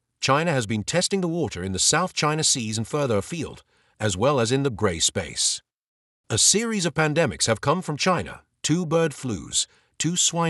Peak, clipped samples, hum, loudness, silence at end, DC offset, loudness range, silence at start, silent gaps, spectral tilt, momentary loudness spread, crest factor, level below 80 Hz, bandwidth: -6 dBFS; under 0.1%; none; -23 LUFS; 0 s; under 0.1%; 2 LU; 0.2 s; 5.77-6.24 s; -3 dB/octave; 8 LU; 18 dB; -54 dBFS; 12 kHz